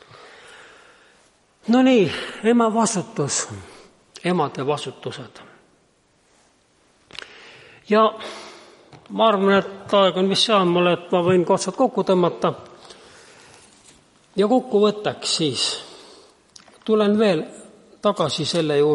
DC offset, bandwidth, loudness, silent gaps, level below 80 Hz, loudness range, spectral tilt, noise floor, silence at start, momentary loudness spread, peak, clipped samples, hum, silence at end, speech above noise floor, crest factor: under 0.1%; 11.5 kHz; -20 LUFS; none; -66 dBFS; 10 LU; -4.5 dB/octave; -61 dBFS; 1.65 s; 19 LU; -4 dBFS; under 0.1%; none; 0 s; 41 dB; 18 dB